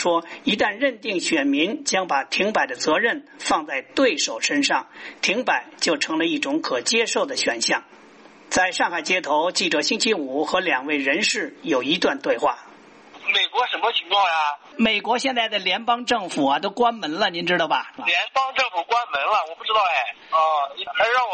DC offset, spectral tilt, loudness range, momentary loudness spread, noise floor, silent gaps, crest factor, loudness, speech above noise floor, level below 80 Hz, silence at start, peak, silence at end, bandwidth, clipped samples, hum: under 0.1%; -2 dB/octave; 1 LU; 4 LU; -48 dBFS; none; 16 dB; -21 LUFS; 26 dB; -64 dBFS; 0 s; -6 dBFS; 0 s; 8.8 kHz; under 0.1%; none